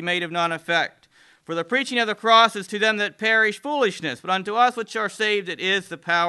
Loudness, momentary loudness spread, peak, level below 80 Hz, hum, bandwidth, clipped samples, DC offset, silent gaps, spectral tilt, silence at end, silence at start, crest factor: -21 LUFS; 9 LU; -2 dBFS; -76 dBFS; none; 12.5 kHz; under 0.1%; under 0.1%; none; -3 dB/octave; 0 s; 0 s; 20 dB